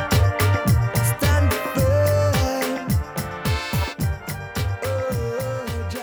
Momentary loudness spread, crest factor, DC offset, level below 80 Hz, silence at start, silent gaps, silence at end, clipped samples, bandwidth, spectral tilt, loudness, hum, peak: 8 LU; 12 dB; under 0.1%; -32 dBFS; 0 s; none; 0 s; under 0.1%; over 20 kHz; -5.5 dB/octave; -22 LUFS; none; -8 dBFS